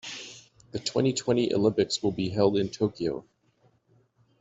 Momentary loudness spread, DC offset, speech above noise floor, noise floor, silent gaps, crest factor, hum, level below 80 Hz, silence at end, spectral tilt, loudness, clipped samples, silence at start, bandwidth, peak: 15 LU; under 0.1%; 40 dB; -66 dBFS; none; 20 dB; none; -62 dBFS; 1.2 s; -5.5 dB/octave; -27 LUFS; under 0.1%; 0.05 s; 8.2 kHz; -8 dBFS